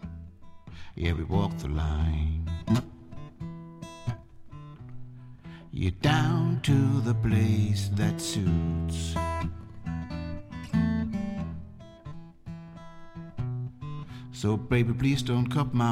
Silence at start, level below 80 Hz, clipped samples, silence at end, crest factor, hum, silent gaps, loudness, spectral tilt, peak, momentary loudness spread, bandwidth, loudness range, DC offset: 0 s; -40 dBFS; under 0.1%; 0 s; 18 dB; none; none; -28 LUFS; -6.5 dB/octave; -12 dBFS; 22 LU; 15.5 kHz; 10 LU; under 0.1%